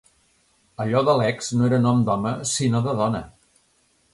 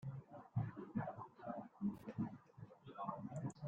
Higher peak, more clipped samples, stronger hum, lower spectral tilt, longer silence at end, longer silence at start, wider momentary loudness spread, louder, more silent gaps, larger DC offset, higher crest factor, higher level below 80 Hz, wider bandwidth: first, -6 dBFS vs -30 dBFS; neither; neither; second, -5.5 dB/octave vs -9 dB/octave; first, 0.85 s vs 0 s; first, 0.8 s vs 0 s; second, 6 LU vs 11 LU; first, -22 LUFS vs -48 LUFS; neither; neither; about the same, 16 dB vs 18 dB; first, -54 dBFS vs -76 dBFS; first, 11.5 kHz vs 9.4 kHz